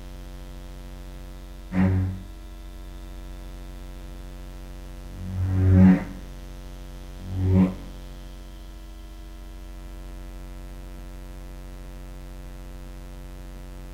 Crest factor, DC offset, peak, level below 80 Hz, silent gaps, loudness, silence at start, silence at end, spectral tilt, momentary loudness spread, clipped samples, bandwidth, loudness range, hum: 22 dB; under 0.1%; -6 dBFS; -38 dBFS; none; -23 LUFS; 0 s; 0 s; -8.5 dB/octave; 21 LU; under 0.1%; 15 kHz; 19 LU; none